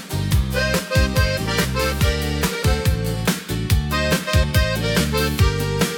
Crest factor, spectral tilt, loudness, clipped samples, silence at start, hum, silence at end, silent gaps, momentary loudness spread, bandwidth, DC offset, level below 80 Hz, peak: 16 dB; -4.5 dB/octave; -20 LUFS; under 0.1%; 0 s; none; 0 s; none; 3 LU; 18 kHz; under 0.1%; -26 dBFS; -4 dBFS